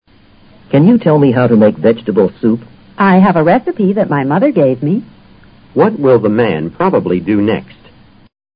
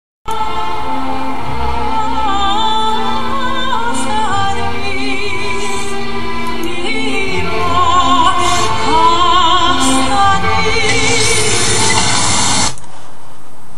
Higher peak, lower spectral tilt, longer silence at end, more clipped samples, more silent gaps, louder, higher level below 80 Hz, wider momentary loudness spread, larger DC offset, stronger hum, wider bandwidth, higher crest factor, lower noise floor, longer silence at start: about the same, 0 dBFS vs 0 dBFS; first, -12.5 dB/octave vs -2.5 dB/octave; first, 0.9 s vs 0 s; neither; neither; about the same, -12 LUFS vs -14 LUFS; second, -46 dBFS vs -32 dBFS; about the same, 7 LU vs 9 LU; second, under 0.1% vs 20%; neither; second, 5.2 kHz vs 13.5 kHz; about the same, 12 dB vs 16 dB; first, -44 dBFS vs -39 dBFS; first, 0.7 s vs 0.25 s